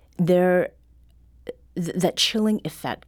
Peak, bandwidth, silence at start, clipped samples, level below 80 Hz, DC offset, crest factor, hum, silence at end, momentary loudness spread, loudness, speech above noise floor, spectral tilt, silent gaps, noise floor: -6 dBFS; 19.5 kHz; 0.2 s; under 0.1%; -54 dBFS; under 0.1%; 16 dB; none; 0.1 s; 20 LU; -22 LUFS; 32 dB; -5 dB/octave; none; -53 dBFS